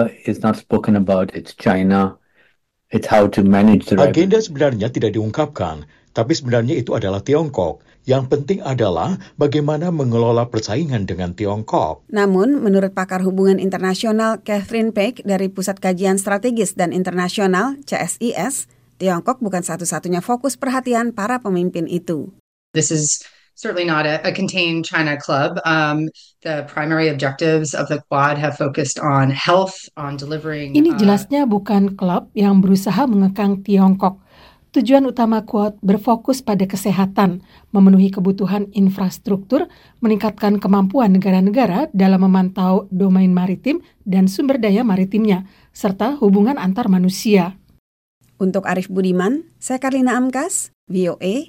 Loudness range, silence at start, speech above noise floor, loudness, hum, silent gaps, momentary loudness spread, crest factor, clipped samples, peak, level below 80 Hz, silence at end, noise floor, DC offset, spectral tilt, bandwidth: 4 LU; 0 s; 44 dB; -17 LUFS; none; 22.40-22.74 s, 47.79-48.21 s, 50.74-50.87 s; 9 LU; 16 dB; under 0.1%; 0 dBFS; -52 dBFS; 0.05 s; -60 dBFS; under 0.1%; -6 dB/octave; 16.5 kHz